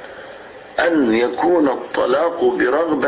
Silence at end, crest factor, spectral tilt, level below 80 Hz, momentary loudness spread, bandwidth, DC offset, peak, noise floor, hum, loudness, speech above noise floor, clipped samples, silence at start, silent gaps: 0 s; 12 dB; -9 dB/octave; -54 dBFS; 19 LU; 4 kHz; under 0.1%; -4 dBFS; -37 dBFS; none; -17 LUFS; 21 dB; under 0.1%; 0 s; none